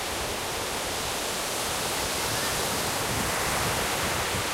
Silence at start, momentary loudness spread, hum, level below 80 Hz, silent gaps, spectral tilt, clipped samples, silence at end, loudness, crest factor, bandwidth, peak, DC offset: 0 s; 4 LU; none; -46 dBFS; none; -2 dB/octave; under 0.1%; 0 s; -27 LUFS; 14 dB; 16 kHz; -14 dBFS; under 0.1%